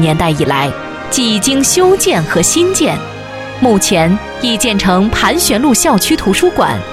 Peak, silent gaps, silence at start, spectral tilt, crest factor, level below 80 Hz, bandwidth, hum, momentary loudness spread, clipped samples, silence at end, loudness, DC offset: 0 dBFS; none; 0 s; -3.5 dB/octave; 12 dB; -34 dBFS; 16.5 kHz; none; 7 LU; under 0.1%; 0 s; -11 LUFS; under 0.1%